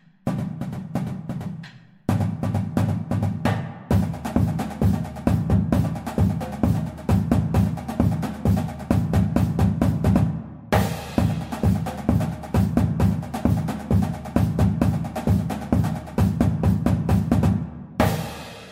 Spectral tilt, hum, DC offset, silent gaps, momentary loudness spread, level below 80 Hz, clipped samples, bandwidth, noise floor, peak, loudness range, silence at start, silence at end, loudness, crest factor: -8 dB/octave; none; under 0.1%; none; 8 LU; -34 dBFS; under 0.1%; 16 kHz; -42 dBFS; -4 dBFS; 3 LU; 0.25 s; 0 s; -23 LUFS; 18 dB